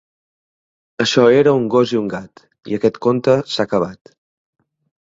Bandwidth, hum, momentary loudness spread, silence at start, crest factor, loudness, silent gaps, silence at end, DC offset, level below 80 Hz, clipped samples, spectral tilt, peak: 7.8 kHz; none; 14 LU; 1 s; 18 dB; -16 LUFS; none; 1.1 s; under 0.1%; -58 dBFS; under 0.1%; -5.5 dB/octave; 0 dBFS